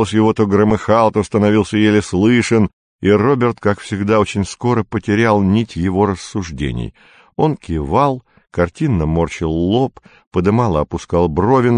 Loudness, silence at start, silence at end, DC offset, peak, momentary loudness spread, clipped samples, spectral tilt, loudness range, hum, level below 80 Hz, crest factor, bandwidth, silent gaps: -16 LUFS; 0 s; 0 s; under 0.1%; 0 dBFS; 9 LU; under 0.1%; -7 dB/octave; 5 LU; none; -34 dBFS; 14 dB; 10 kHz; 2.73-2.99 s, 10.27-10.31 s